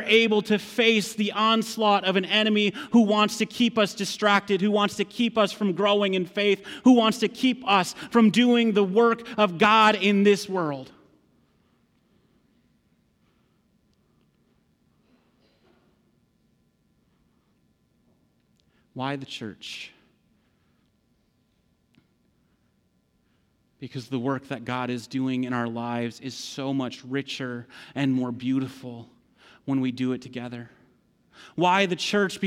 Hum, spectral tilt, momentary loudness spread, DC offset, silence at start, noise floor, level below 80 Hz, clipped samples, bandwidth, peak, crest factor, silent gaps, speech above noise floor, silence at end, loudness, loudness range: none; -5 dB/octave; 17 LU; under 0.1%; 0 s; -68 dBFS; -72 dBFS; under 0.1%; 15.5 kHz; -8 dBFS; 18 dB; none; 44 dB; 0 s; -23 LUFS; 18 LU